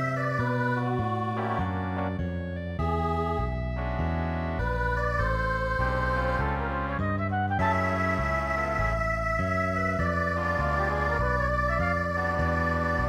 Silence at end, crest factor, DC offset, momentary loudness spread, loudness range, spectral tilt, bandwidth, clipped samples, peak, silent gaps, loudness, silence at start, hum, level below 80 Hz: 0 s; 14 dB; under 0.1%; 4 LU; 3 LU; -7.5 dB/octave; 12.5 kHz; under 0.1%; -12 dBFS; none; -28 LUFS; 0 s; none; -36 dBFS